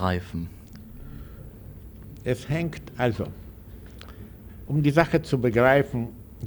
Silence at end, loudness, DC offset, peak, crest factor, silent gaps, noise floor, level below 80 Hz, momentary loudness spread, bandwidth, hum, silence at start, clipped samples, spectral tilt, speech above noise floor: 0 s; -25 LUFS; under 0.1%; -4 dBFS; 24 dB; none; -43 dBFS; -46 dBFS; 24 LU; over 20 kHz; none; 0 s; under 0.1%; -7.5 dB/octave; 19 dB